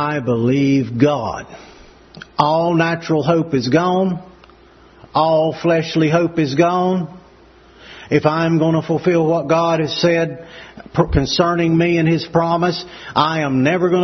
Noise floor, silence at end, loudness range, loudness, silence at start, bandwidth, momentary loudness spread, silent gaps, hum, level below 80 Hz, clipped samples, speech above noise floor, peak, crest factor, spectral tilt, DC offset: -46 dBFS; 0 s; 1 LU; -17 LUFS; 0 s; 6.4 kHz; 9 LU; none; none; -40 dBFS; under 0.1%; 30 dB; 0 dBFS; 16 dB; -6.5 dB/octave; under 0.1%